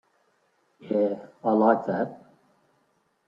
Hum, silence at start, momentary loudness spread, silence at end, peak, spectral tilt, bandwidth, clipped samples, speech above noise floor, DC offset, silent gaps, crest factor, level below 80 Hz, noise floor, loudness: none; 0.85 s; 9 LU; 1.1 s; -8 dBFS; -9.5 dB/octave; 5.4 kHz; under 0.1%; 45 dB; under 0.1%; none; 20 dB; -74 dBFS; -70 dBFS; -25 LUFS